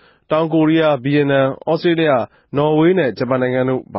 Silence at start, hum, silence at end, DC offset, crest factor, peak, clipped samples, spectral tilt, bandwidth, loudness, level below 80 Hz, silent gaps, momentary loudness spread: 0.3 s; none; 0 s; under 0.1%; 12 dB; -4 dBFS; under 0.1%; -12 dB/octave; 5.8 kHz; -16 LUFS; -56 dBFS; none; 5 LU